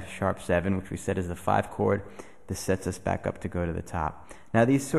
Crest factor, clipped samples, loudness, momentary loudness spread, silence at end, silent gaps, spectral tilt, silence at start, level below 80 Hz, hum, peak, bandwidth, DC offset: 18 dB; under 0.1%; -29 LUFS; 9 LU; 0 s; none; -6.5 dB/octave; 0 s; -48 dBFS; none; -10 dBFS; 13 kHz; 0.4%